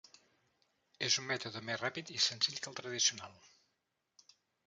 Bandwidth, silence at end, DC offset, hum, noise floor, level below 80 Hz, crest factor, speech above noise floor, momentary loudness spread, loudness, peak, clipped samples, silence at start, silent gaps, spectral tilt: 10.5 kHz; 1.2 s; under 0.1%; none; -84 dBFS; -80 dBFS; 24 dB; 47 dB; 10 LU; -35 LUFS; -16 dBFS; under 0.1%; 1 s; none; -1 dB/octave